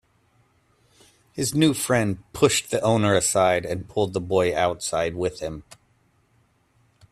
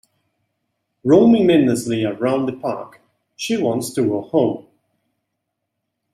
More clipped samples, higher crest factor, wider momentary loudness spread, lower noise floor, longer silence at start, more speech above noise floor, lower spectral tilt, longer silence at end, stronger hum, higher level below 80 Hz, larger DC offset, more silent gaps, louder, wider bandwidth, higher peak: neither; about the same, 20 dB vs 18 dB; second, 9 LU vs 14 LU; second, -64 dBFS vs -77 dBFS; first, 1.35 s vs 1.05 s; second, 42 dB vs 60 dB; second, -4.5 dB/octave vs -6 dB/octave; second, 1.35 s vs 1.55 s; neither; first, -54 dBFS vs -60 dBFS; neither; neither; second, -23 LUFS vs -18 LUFS; about the same, 15.5 kHz vs 15 kHz; about the same, -4 dBFS vs -2 dBFS